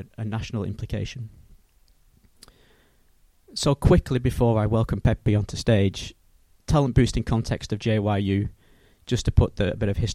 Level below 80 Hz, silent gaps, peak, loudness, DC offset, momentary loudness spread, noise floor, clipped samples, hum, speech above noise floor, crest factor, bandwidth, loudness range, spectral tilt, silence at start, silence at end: -34 dBFS; none; -4 dBFS; -24 LUFS; under 0.1%; 13 LU; -59 dBFS; under 0.1%; none; 36 dB; 20 dB; 13 kHz; 10 LU; -6.5 dB/octave; 0 s; 0 s